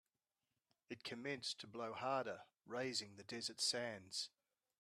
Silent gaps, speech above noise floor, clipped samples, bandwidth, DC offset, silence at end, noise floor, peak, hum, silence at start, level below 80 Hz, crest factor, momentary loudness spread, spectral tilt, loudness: none; over 44 dB; under 0.1%; 13.5 kHz; under 0.1%; 0.55 s; under -90 dBFS; -26 dBFS; none; 0.9 s; -90 dBFS; 22 dB; 12 LU; -2 dB/octave; -45 LUFS